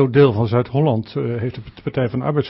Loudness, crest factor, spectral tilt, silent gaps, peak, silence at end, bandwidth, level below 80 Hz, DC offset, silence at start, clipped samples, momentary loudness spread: -19 LUFS; 16 dB; -12.5 dB/octave; none; -2 dBFS; 0 s; 5.8 kHz; -48 dBFS; under 0.1%; 0 s; under 0.1%; 12 LU